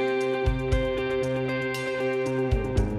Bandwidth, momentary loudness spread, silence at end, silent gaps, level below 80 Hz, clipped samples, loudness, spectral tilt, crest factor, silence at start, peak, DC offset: 14 kHz; 2 LU; 0 s; none; -32 dBFS; under 0.1%; -27 LUFS; -6.5 dB/octave; 14 dB; 0 s; -12 dBFS; under 0.1%